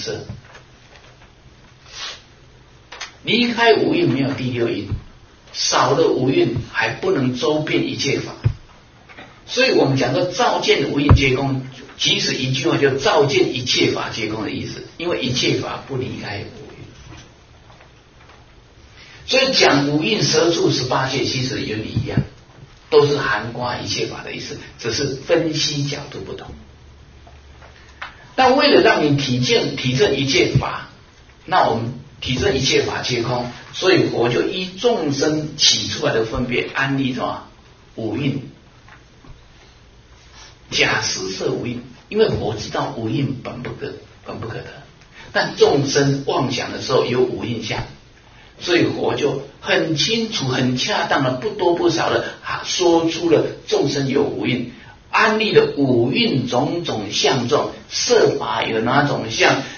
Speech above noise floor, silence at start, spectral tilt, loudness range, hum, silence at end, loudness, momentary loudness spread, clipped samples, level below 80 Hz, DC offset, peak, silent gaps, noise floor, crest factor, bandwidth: 28 dB; 0 s; -4.5 dB/octave; 7 LU; none; 0 s; -18 LUFS; 15 LU; under 0.1%; -42 dBFS; under 0.1%; 0 dBFS; none; -47 dBFS; 20 dB; 7 kHz